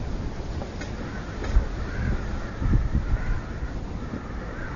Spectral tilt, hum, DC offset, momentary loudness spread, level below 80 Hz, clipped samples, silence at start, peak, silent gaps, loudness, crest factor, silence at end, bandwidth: -7 dB/octave; none; under 0.1%; 8 LU; -28 dBFS; under 0.1%; 0 s; -8 dBFS; none; -30 LUFS; 18 dB; 0 s; 7.4 kHz